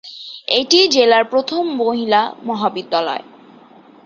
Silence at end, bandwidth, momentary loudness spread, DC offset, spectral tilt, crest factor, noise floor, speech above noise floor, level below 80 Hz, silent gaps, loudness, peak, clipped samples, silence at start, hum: 0.85 s; 7.6 kHz; 12 LU; under 0.1%; -2.5 dB/octave; 18 dB; -44 dBFS; 29 dB; -64 dBFS; none; -16 LUFS; 0 dBFS; under 0.1%; 0.05 s; none